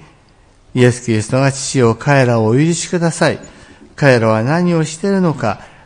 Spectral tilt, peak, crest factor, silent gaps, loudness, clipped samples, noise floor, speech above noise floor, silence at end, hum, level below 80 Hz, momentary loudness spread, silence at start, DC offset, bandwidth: -6 dB/octave; 0 dBFS; 14 dB; none; -14 LUFS; under 0.1%; -48 dBFS; 35 dB; 0.2 s; none; -48 dBFS; 5 LU; 0.75 s; under 0.1%; 10.5 kHz